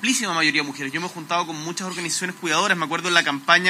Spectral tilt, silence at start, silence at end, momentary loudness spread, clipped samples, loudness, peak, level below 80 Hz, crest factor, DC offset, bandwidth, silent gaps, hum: -2 dB/octave; 0 s; 0 s; 9 LU; under 0.1%; -22 LUFS; 0 dBFS; -84 dBFS; 22 dB; under 0.1%; 16 kHz; none; none